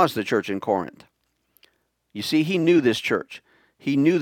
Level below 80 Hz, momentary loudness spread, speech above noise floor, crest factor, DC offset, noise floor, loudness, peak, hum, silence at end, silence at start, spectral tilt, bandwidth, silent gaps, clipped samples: -68 dBFS; 19 LU; 45 dB; 20 dB; under 0.1%; -67 dBFS; -22 LUFS; -2 dBFS; none; 0 s; 0 s; -5.5 dB/octave; 17 kHz; none; under 0.1%